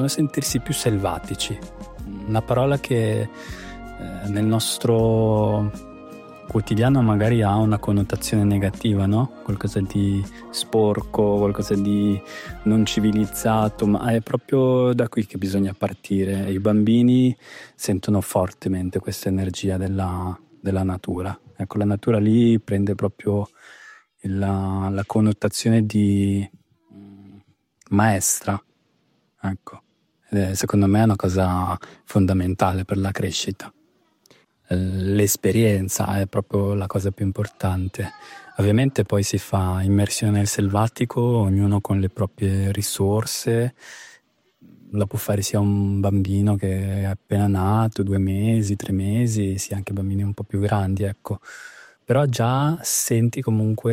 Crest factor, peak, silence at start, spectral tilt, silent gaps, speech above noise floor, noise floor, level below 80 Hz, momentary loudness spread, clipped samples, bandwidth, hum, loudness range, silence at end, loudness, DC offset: 18 dB; -4 dBFS; 0 s; -6 dB/octave; none; 45 dB; -66 dBFS; -48 dBFS; 12 LU; under 0.1%; 16 kHz; none; 4 LU; 0 s; -22 LUFS; under 0.1%